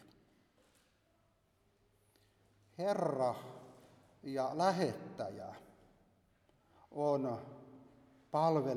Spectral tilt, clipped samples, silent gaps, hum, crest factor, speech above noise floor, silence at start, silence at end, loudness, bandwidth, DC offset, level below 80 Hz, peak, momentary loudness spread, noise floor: -6.5 dB/octave; under 0.1%; none; none; 22 dB; 39 dB; 2.8 s; 0 s; -37 LUFS; 15 kHz; under 0.1%; -80 dBFS; -18 dBFS; 21 LU; -75 dBFS